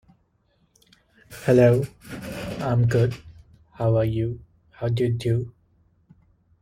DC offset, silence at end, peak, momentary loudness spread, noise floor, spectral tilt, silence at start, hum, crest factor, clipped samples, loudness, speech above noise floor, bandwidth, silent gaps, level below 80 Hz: under 0.1%; 1.1 s; -6 dBFS; 20 LU; -66 dBFS; -8 dB/octave; 1.3 s; none; 20 dB; under 0.1%; -23 LUFS; 45 dB; 15 kHz; none; -50 dBFS